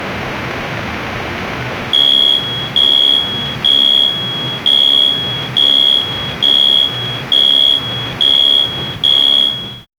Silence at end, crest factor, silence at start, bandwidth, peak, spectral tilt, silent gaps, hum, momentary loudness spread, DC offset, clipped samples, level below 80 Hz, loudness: 0.15 s; 14 dB; 0 s; over 20 kHz; 0 dBFS; -3 dB/octave; none; none; 13 LU; under 0.1%; under 0.1%; -42 dBFS; -9 LUFS